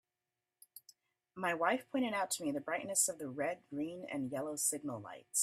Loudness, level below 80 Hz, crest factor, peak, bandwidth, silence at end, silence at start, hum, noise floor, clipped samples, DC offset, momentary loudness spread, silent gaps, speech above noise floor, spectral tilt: -37 LUFS; -84 dBFS; 22 dB; -18 dBFS; 15.5 kHz; 0 s; 0.75 s; none; under -90 dBFS; under 0.1%; under 0.1%; 20 LU; none; over 53 dB; -2.5 dB/octave